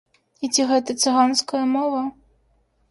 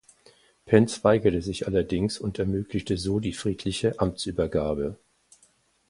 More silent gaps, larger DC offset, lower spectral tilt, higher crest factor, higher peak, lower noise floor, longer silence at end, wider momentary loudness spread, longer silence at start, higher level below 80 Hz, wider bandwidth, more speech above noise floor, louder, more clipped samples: neither; neither; second, -1.5 dB/octave vs -6 dB/octave; second, 16 dB vs 24 dB; second, -6 dBFS vs -2 dBFS; about the same, -63 dBFS vs -64 dBFS; second, 0.8 s vs 0.95 s; about the same, 10 LU vs 8 LU; second, 0.4 s vs 0.65 s; second, -66 dBFS vs -46 dBFS; about the same, 11.5 kHz vs 11.5 kHz; first, 43 dB vs 39 dB; first, -21 LUFS vs -26 LUFS; neither